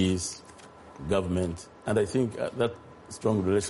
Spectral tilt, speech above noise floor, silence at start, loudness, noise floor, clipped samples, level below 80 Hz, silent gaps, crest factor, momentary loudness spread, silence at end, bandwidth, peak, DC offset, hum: -5.5 dB/octave; 21 dB; 0 s; -29 LUFS; -49 dBFS; under 0.1%; -52 dBFS; none; 16 dB; 20 LU; 0 s; 11.5 kHz; -12 dBFS; under 0.1%; none